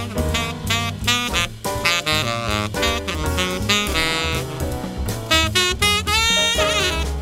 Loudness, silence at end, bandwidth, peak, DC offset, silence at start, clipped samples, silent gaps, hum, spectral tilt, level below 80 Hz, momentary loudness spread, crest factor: -19 LUFS; 0 s; 16 kHz; -2 dBFS; under 0.1%; 0 s; under 0.1%; none; none; -3 dB/octave; -30 dBFS; 8 LU; 18 dB